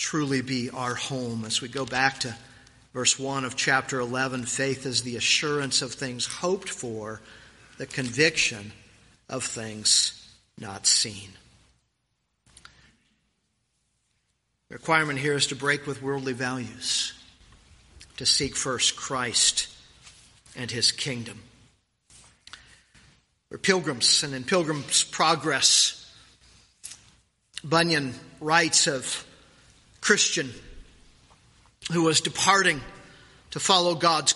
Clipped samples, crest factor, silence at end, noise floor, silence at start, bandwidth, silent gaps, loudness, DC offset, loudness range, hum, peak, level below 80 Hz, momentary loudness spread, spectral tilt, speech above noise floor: under 0.1%; 24 dB; 0 s; -76 dBFS; 0 s; 11.5 kHz; none; -24 LUFS; under 0.1%; 6 LU; none; -4 dBFS; -60 dBFS; 18 LU; -2 dB/octave; 50 dB